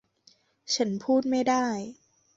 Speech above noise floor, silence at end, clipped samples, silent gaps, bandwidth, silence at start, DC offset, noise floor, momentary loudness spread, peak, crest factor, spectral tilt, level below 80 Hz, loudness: 37 dB; 0.45 s; under 0.1%; none; 7.8 kHz; 0.65 s; under 0.1%; -63 dBFS; 9 LU; -12 dBFS; 16 dB; -4 dB/octave; -70 dBFS; -27 LUFS